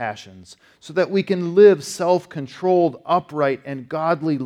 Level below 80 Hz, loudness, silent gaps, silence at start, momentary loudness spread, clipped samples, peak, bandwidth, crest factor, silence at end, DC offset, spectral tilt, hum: -68 dBFS; -19 LUFS; none; 0 s; 15 LU; under 0.1%; -2 dBFS; 13 kHz; 18 dB; 0 s; under 0.1%; -6 dB/octave; none